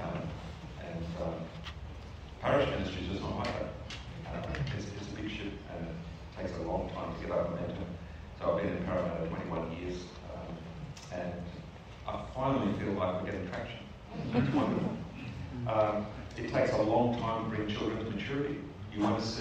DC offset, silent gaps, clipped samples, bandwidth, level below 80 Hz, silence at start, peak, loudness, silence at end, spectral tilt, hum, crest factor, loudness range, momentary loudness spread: under 0.1%; none; under 0.1%; 9.2 kHz; -50 dBFS; 0 s; -16 dBFS; -35 LUFS; 0 s; -7 dB/octave; none; 20 dB; 6 LU; 14 LU